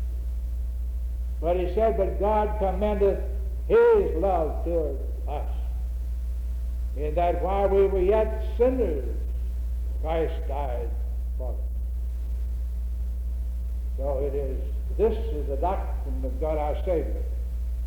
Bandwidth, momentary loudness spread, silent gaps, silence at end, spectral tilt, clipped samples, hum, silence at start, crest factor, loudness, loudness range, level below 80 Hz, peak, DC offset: 4 kHz; 10 LU; none; 0 s; -9 dB/octave; under 0.1%; none; 0 s; 14 dB; -27 LUFS; 7 LU; -28 dBFS; -10 dBFS; under 0.1%